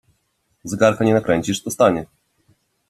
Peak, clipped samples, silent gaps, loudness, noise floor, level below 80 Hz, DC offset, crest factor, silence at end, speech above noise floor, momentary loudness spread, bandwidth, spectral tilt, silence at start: -2 dBFS; under 0.1%; none; -18 LUFS; -68 dBFS; -54 dBFS; under 0.1%; 20 dB; 0.85 s; 50 dB; 12 LU; 14.5 kHz; -5.5 dB/octave; 0.65 s